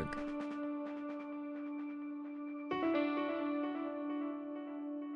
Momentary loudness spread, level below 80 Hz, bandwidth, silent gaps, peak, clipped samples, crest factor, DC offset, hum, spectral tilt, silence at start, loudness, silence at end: 9 LU; -68 dBFS; 6 kHz; none; -24 dBFS; under 0.1%; 16 dB; under 0.1%; none; -7 dB/octave; 0 s; -40 LUFS; 0 s